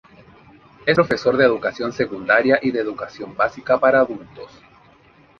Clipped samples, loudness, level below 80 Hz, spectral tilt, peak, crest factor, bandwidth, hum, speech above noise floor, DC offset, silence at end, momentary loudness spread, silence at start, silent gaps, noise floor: under 0.1%; -19 LUFS; -56 dBFS; -6 dB/octave; -2 dBFS; 18 dB; 7 kHz; none; 33 dB; under 0.1%; 0.95 s; 15 LU; 0.85 s; none; -52 dBFS